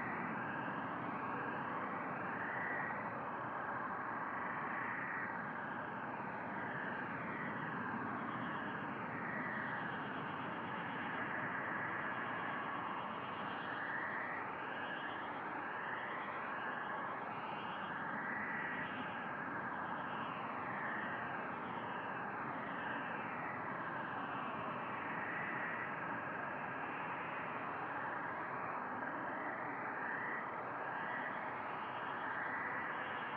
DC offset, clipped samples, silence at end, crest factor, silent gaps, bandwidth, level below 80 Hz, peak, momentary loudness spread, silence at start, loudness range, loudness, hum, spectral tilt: under 0.1%; under 0.1%; 0 s; 14 dB; none; 6.6 kHz; -80 dBFS; -28 dBFS; 3 LU; 0 s; 1 LU; -42 LUFS; none; -3.5 dB/octave